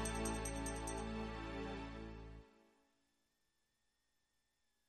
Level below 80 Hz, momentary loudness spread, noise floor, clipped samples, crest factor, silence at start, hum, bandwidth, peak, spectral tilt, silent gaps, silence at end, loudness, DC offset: -54 dBFS; 13 LU; -85 dBFS; under 0.1%; 20 dB; 0 s; none; 13 kHz; -28 dBFS; -4 dB/octave; none; 2.35 s; -45 LUFS; under 0.1%